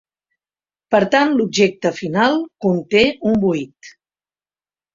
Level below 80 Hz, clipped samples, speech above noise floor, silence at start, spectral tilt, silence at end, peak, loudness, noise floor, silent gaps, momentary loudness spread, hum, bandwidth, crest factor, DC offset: -54 dBFS; under 0.1%; over 73 dB; 0.9 s; -5 dB/octave; 1.05 s; -2 dBFS; -17 LUFS; under -90 dBFS; none; 5 LU; 50 Hz at -40 dBFS; 7.6 kHz; 18 dB; under 0.1%